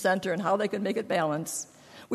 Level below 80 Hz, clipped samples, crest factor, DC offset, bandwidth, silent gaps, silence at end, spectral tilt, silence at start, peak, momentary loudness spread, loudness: -72 dBFS; under 0.1%; 16 dB; under 0.1%; 14.5 kHz; none; 0 s; -4.5 dB/octave; 0 s; -14 dBFS; 8 LU; -29 LUFS